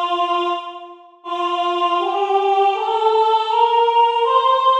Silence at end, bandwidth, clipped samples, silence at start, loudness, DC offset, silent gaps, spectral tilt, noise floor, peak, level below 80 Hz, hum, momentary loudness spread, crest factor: 0 s; 9 kHz; under 0.1%; 0 s; -17 LUFS; under 0.1%; none; -1 dB/octave; -38 dBFS; -4 dBFS; -82 dBFS; none; 11 LU; 14 dB